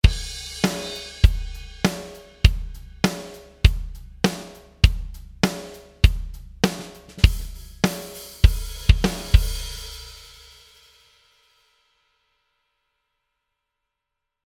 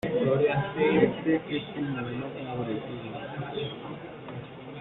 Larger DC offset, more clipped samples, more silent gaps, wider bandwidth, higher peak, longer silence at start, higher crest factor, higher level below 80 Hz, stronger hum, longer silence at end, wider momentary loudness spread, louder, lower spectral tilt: neither; neither; neither; first, 16 kHz vs 4.2 kHz; first, 0 dBFS vs -10 dBFS; about the same, 0.05 s vs 0.05 s; about the same, 24 dB vs 20 dB; first, -26 dBFS vs -60 dBFS; neither; first, 4.3 s vs 0 s; about the same, 18 LU vs 16 LU; first, -23 LUFS vs -29 LUFS; about the same, -5 dB/octave vs -5.5 dB/octave